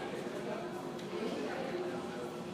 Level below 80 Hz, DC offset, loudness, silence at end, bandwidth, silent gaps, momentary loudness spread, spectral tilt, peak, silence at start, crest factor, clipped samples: -72 dBFS; under 0.1%; -40 LUFS; 0 s; 15.5 kHz; none; 4 LU; -5.5 dB/octave; -26 dBFS; 0 s; 14 dB; under 0.1%